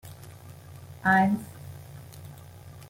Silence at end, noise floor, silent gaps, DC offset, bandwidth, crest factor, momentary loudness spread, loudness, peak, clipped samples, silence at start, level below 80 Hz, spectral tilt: 0.05 s; -46 dBFS; none; under 0.1%; 16.5 kHz; 22 dB; 25 LU; -24 LUFS; -8 dBFS; under 0.1%; 0.05 s; -64 dBFS; -6.5 dB/octave